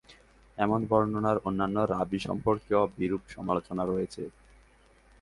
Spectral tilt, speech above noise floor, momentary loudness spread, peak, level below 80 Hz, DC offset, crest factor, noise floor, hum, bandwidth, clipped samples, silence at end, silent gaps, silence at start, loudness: -7.5 dB/octave; 31 dB; 9 LU; -10 dBFS; -56 dBFS; under 0.1%; 20 dB; -60 dBFS; none; 11.5 kHz; under 0.1%; 0.9 s; none; 0.1 s; -29 LUFS